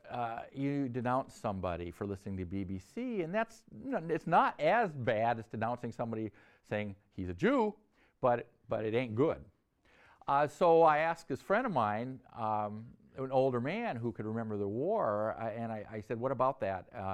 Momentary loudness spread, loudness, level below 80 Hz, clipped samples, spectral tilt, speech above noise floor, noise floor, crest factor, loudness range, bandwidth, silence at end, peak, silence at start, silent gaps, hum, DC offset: 12 LU; -34 LUFS; -66 dBFS; under 0.1%; -7.5 dB/octave; 34 dB; -67 dBFS; 18 dB; 5 LU; 12.5 kHz; 0 s; -16 dBFS; 0.05 s; none; none; under 0.1%